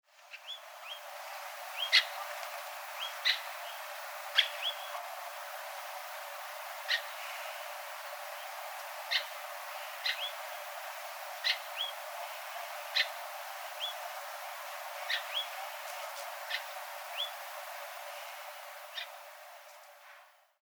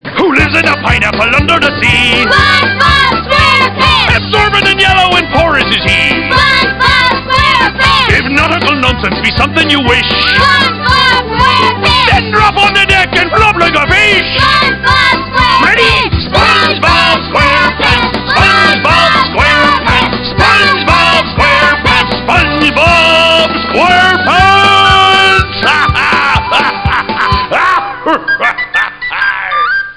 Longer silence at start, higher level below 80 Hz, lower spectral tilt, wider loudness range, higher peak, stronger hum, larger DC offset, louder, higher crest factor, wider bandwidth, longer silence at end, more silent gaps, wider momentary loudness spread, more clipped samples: about the same, 0.1 s vs 0.05 s; second, under -90 dBFS vs -24 dBFS; second, 8 dB/octave vs -4 dB/octave; first, 7 LU vs 2 LU; second, -10 dBFS vs 0 dBFS; neither; second, under 0.1% vs 0.7%; second, -37 LUFS vs -7 LUFS; first, 30 dB vs 8 dB; first, over 20 kHz vs 11 kHz; first, 0.25 s vs 0.05 s; neither; first, 13 LU vs 5 LU; second, under 0.1% vs 3%